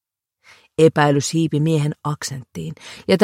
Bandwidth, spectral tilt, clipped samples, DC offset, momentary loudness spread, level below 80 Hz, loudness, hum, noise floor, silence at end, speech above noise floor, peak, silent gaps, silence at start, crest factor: 15 kHz; -5.5 dB/octave; under 0.1%; under 0.1%; 16 LU; -58 dBFS; -19 LUFS; none; -57 dBFS; 0 s; 39 dB; 0 dBFS; none; 0.8 s; 18 dB